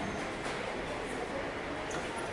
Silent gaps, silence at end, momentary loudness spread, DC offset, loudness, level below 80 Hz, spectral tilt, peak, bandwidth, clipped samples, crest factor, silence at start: none; 0 s; 1 LU; under 0.1%; -37 LUFS; -54 dBFS; -4 dB/octave; -24 dBFS; 11.5 kHz; under 0.1%; 14 dB; 0 s